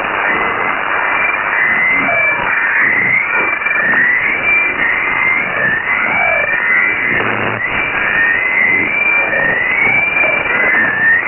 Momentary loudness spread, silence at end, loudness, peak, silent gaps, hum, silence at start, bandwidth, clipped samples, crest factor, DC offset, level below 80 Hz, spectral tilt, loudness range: 4 LU; 0 s; -11 LUFS; -2 dBFS; none; none; 0 s; 3.2 kHz; under 0.1%; 10 dB; under 0.1%; -44 dBFS; -1.5 dB/octave; 1 LU